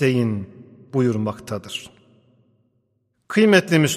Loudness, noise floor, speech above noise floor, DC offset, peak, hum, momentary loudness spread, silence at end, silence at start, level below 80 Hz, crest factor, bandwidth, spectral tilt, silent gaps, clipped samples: -20 LUFS; -69 dBFS; 50 dB; under 0.1%; -2 dBFS; none; 17 LU; 0 s; 0 s; -62 dBFS; 18 dB; 15 kHz; -5.5 dB/octave; none; under 0.1%